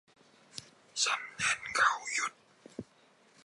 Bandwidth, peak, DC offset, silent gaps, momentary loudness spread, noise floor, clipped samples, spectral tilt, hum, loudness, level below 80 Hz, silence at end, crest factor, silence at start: 11.5 kHz; -12 dBFS; under 0.1%; none; 20 LU; -65 dBFS; under 0.1%; 0.5 dB/octave; none; -31 LUFS; -74 dBFS; 0.6 s; 24 dB; 0.55 s